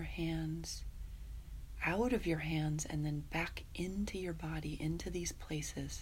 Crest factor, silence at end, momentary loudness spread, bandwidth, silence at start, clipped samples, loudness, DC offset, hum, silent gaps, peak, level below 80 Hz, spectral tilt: 18 dB; 0 s; 15 LU; 16 kHz; 0 s; under 0.1%; -39 LUFS; under 0.1%; none; none; -20 dBFS; -48 dBFS; -5 dB/octave